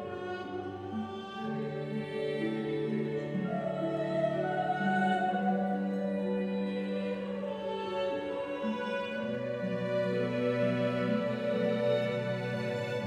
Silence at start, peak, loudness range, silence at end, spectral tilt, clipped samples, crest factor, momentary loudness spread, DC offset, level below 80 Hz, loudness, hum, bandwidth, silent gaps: 0 s; -18 dBFS; 4 LU; 0 s; -7.5 dB/octave; under 0.1%; 14 dB; 7 LU; under 0.1%; -70 dBFS; -33 LUFS; none; 9.6 kHz; none